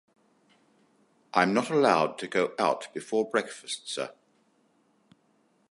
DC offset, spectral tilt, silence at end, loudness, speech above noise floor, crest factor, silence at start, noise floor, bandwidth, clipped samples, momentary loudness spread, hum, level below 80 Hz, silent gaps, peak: under 0.1%; -4.5 dB/octave; 1.6 s; -28 LUFS; 41 dB; 24 dB; 1.35 s; -68 dBFS; 11.5 kHz; under 0.1%; 12 LU; none; -78 dBFS; none; -6 dBFS